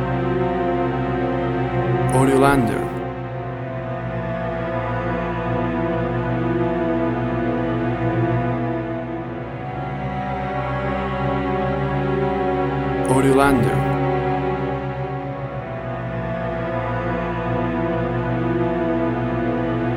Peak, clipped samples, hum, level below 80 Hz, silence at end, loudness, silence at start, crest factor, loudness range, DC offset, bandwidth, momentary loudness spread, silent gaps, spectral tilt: -2 dBFS; under 0.1%; none; -36 dBFS; 0 s; -22 LUFS; 0 s; 20 dB; 5 LU; under 0.1%; 13 kHz; 10 LU; none; -7.5 dB/octave